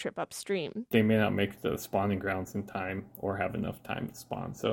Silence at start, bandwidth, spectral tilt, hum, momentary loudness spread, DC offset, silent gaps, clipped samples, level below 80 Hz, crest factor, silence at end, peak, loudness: 0 s; 17 kHz; -6 dB/octave; none; 11 LU; under 0.1%; none; under 0.1%; -60 dBFS; 20 dB; 0 s; -12 dBFS; -32 LUFS